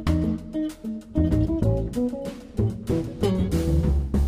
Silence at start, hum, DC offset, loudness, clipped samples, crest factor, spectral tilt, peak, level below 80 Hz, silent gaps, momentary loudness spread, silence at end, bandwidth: 0 s; none; under 0.1%; -25 LUFS; under 0.1%; 14 dB; -8 dB/octave; -10 dBFS; -30 dBFS; none; 8 LU; 0 s; 15.5 kHz